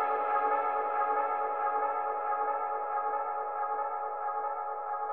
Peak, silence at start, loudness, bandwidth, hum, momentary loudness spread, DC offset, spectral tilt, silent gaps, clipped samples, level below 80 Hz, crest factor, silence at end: -18 dBFS; 0 s; -32 LUFS; 3.8 kHz; none; 5 LU; 0.2%; -5.5 dB/octave; none; under 0.1%; -88 dBFS; 14 dB; 0 s